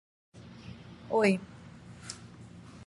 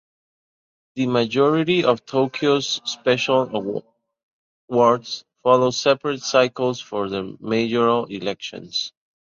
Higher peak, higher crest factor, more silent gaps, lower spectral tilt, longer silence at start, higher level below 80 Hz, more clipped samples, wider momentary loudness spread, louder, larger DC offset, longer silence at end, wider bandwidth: second, -12 dBFS vs -2 dBFS; about the same, 22 dB vs 20 dB; second, none vs 4.23-4.68 s; about the same, -5.5 dB/octave vs -4.5 dB/octave; second, 0.35 s vs 0.95 s; about the same, -62 dBFS vs -64 dBFS; neither; first, 23 LU vs 10 LU; second, -31 LUFS vs -21 LUFS; neither; second, 0.1 s vs 0.5 s; first, 11.5 kHz vs 7.6 kHz